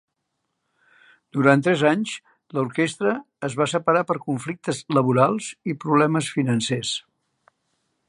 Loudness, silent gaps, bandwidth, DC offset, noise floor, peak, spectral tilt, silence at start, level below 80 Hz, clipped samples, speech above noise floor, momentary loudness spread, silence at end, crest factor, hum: -22 LUFS; none; 11.5 kHz; under 0.1%; -77 dBFS; -2 dBFS; -5.5 dB/octave; 1.35 s; -68 dBFS; under 0.1%; 56 dB; 12 LU; 1.1 s; 22 dB; none